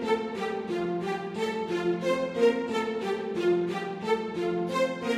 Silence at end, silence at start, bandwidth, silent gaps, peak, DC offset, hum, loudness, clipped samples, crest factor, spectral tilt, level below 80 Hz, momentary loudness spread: 0 s; 0 s; 13.5 kHz; none; -12 dBFS; under 0.1%; none; -29 LUFS; under 0.1%; 16 dB; -6 dB/octave; -66 dBFS; 6 LU